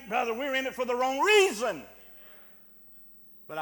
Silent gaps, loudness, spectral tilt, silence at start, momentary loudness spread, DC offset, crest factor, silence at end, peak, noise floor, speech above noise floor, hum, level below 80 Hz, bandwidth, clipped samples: none; -26 LUFS; -2 dB/octave; 0 s; 27 LU; under 0.1%; 20 dB; 0 s; -8 dBFS; -53 dBFS; 26 dB; none; -68 dBFS; 19 kHz; under 0.1%